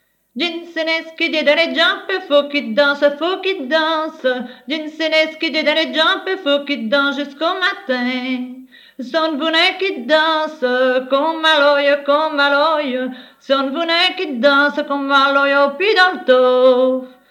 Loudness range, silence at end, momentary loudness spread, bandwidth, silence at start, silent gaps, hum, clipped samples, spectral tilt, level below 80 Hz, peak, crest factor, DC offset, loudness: 4 LU; 0.2 s; 9 LU; 13.5 kHz; 0.35 s; none; 50 Hz at -70 dBFS; under 0.1%; -3 dB/octave; -74 dBFS; 0 dBFS; 16 dB; under 0.1%; -16 LUFS